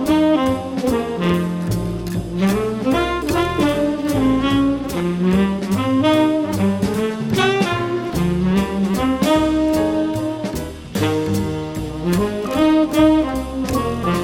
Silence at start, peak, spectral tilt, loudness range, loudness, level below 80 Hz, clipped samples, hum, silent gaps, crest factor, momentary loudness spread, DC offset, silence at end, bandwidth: 0 s; -2 dBFS; -6.5 dB/octave; 2 LU; -19 LUFS; -36 dBFS; under 0.1%; none; none; 16 dB; 8 LU; under 0.1%; 0 s; 17 kHz